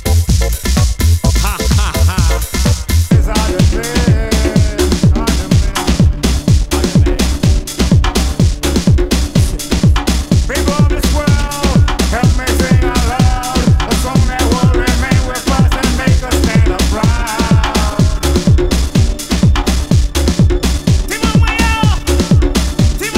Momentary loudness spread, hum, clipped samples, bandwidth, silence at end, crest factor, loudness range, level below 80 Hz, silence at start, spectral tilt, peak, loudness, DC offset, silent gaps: 3 LU; none; under 0.1%; 16.5 kHz; 0 s; 12 dB; 1 LU; -16 dBFS; 0 s; -5.5 dB/octave; 0 dBFS; -13 LUFS; under 0.1%; none